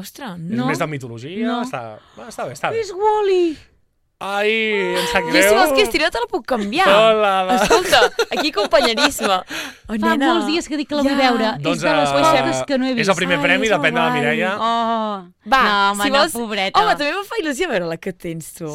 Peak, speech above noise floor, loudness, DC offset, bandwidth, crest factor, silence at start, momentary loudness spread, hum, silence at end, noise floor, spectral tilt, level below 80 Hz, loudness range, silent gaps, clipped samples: 0 dBFS; 26 dB; -17 LUFS; under 0.1%; 16.5 kHz; 18 dB; 0 s; 14 LU; none; 0 s; -43 dBFS; -3.5 dB/octave; -46 dBFS; 6 LU; none; under 0.1%